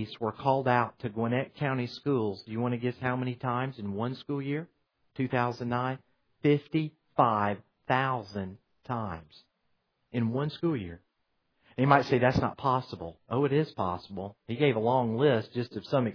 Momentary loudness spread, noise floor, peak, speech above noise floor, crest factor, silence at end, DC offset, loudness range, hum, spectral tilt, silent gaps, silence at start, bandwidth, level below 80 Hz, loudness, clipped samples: 13 LU; -77 dBFS; -6 dBFS; 47 dB; 24 dB; 0 s; under 0.1%; 5 LU; none; -8.5 dB/octave; none; 0 s; 5.4 kHz; -60 dBFS; -30 LUFS; under 0.1%